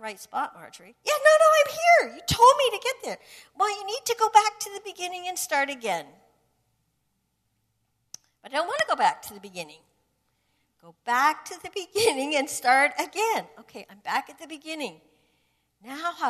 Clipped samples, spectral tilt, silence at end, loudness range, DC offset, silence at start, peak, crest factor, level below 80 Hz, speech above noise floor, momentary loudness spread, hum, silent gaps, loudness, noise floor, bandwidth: under 0.1%; -2 dB/octave; 0 s; 11 LU; under 0.1%; 0 s; -6 dBFS; 22 dB; -60 dBFS; 50 dB; 21 LU; none; none; -24 LUFS; -75 dBFS; 14 kHz